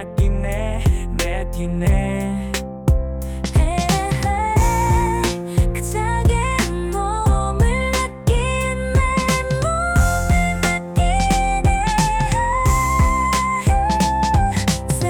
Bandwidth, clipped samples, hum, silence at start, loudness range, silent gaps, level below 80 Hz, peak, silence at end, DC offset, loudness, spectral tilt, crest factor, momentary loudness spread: 19 kHz; under 0.1%; none; 0 s; 3 LU; none; -22 dBFS; -6 dBFS; 0 s; under 0.1%; -19 LUFS; -5 dB/octave; 12 dB; 5 LU